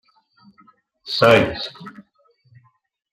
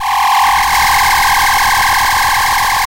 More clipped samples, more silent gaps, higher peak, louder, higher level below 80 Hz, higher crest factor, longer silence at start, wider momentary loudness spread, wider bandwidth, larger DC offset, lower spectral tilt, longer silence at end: neither; neither; about the same, -2 dBFS vs -2 dBFS; second, -17 LUFS vs -10 LUFS; second, -54 dBFS vs -30 dBFS; first, 20 dB vs 8 dB; first, 1.05 s vs 0 s; first, 27 LU vs 2 LU; about the same, 15.5 kHz vs 16 kHz; neither; first, -5.5 dB/octave vs 0 dB/octave; first, 1.25 s vs 0.05 s